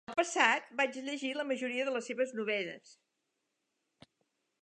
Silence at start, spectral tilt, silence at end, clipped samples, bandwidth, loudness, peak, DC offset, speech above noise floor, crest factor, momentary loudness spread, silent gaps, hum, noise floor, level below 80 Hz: 0.1 s; -2 dB/octave; 1.7 s; under 0.1%; 10.5 kHz; -33 LUFS; -12 dBFS; under 0.1%; 50 dB; 24 dB; 9 LU; none; none; -84 dBFS; -86 dBFS